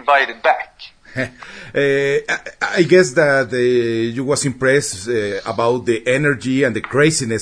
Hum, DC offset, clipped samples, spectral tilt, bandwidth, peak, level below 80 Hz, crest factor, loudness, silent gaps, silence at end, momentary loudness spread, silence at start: none; under 0.1%; under 0.1%; -4.5 dB/octave; 11 kHz; 0 dBFS; -52 dBFS; 16 dB; -17 LUFS; none; 0 s; 11 LU; 0 s